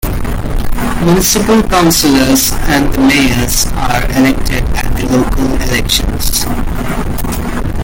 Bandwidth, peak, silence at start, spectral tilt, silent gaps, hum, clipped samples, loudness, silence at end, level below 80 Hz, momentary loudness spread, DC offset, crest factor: 17 kHz; 0 dBFS; 0 s; -4 dB/octave; none; none; under 0.1%; -12 LUFS; 0 s; -18 dBFS; 10 LU; under 0.1%; 10 dB